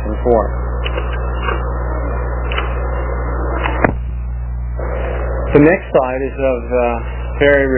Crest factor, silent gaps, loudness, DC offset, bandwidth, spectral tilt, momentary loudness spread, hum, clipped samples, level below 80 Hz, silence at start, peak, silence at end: 16 dB; none; -17 LUFS; 0.1%; 3.2 kHz; -11 dB/octave; 11 LU; 60 Hz at -20 dBFS; under 0.1%; -20 dBFS; 0 s; 0 dBFS; 0 s